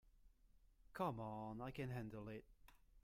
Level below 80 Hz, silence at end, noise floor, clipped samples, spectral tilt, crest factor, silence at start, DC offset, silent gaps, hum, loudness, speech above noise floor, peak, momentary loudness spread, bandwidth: -70 dBFS; 0.05 s; -72 dBFS; under 0.1%; -7.5 dB/octave; 22 dB; 0.05 s; under 0.1%; none; none; -50 LUFS; 23 dB; -30 dBFS; 11 LU; 16 kHz